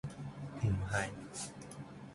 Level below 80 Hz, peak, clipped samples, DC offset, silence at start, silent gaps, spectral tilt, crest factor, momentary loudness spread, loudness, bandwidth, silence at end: -54 dBFS; -20 dBFS; under 0.1%; under 0.1%; 0.05 s; none; -5 dB/octave; 20 dB; 14 LU; -40 LUFS; 11.5 kHz; 0 s